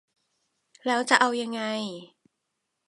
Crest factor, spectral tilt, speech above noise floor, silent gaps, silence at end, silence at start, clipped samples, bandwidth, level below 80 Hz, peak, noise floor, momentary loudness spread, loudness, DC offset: 26 dB; -2.5 dB/octave; 55 dB; none; 0.8 s; 0.85 s; under 0.1%; 11.5 kHz; -82 dBFS; -4 dBFS; -81 dBFS; 15 LU; -25 LUFS; under 0.1%